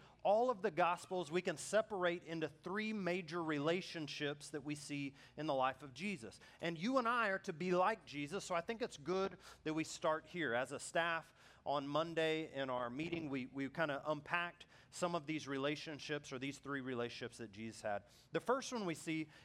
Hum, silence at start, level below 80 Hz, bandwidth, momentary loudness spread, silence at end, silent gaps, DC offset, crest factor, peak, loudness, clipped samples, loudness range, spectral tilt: none; 0 s; -76 dBFS; 15 kHz; 9 LU; 0 s; none; under 0.1%; 20 dB; -20 dBFS; -41 LUFS; under 0.1%; 4 LU; -4.5 dB/octave